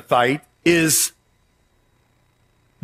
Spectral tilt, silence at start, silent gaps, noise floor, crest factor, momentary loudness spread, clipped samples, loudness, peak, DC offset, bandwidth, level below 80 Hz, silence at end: -3 dB/octave; 0.1 s; none; -62 dBFS; 20 dB; 6 LU; under 0.1%; -18 LUFS; -2 dBFS; under 0.1%; 16 kHz; -60 dBFS; 1.75 s